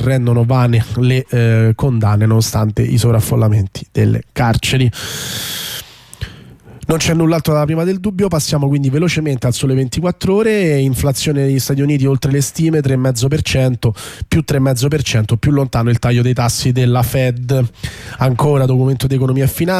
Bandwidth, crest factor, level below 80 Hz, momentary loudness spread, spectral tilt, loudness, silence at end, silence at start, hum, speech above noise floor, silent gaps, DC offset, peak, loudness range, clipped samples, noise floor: 15.5 kHz; 10 dB; -36 dBFS; 7 LU; -6 dB/octave; -14 LUFS; 0 s; 0 s; none; 24 dB; none; under 0.1%; -4 dBFS; 3 LU; under 0.1%; -38 dBFS